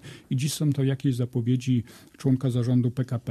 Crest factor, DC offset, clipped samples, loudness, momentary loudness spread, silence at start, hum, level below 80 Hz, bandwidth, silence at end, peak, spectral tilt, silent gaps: 14 dB; under 0.1%; under 0.1%; -26 LUFS; 6 LU; 0.05 s; none; -60 dBFS; 13.5 kHz; 0 s; -12 dBFS; -7 dB/octave; none